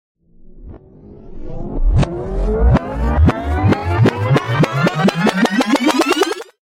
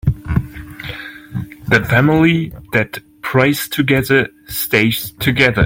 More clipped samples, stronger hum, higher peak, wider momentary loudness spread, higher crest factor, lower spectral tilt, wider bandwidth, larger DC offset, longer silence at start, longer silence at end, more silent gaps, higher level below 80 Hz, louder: neither; neither; about the same, -2 dBFS vs 0 dBFS; second, 8 LU vs 15 LU; about the same, 14 dB vs 16 dB; about the same, -6.5 dB/octave vs -5.5 dB/octave; about the same, 16 kHz vs 17 kHz; neither; first, 0.45 s vs 0.05 s; first, 0.25 s vs 0 s; neither; first, -22 dBFS vs -36 dBFS; about the same, -16 LUFS vs -15 LUFS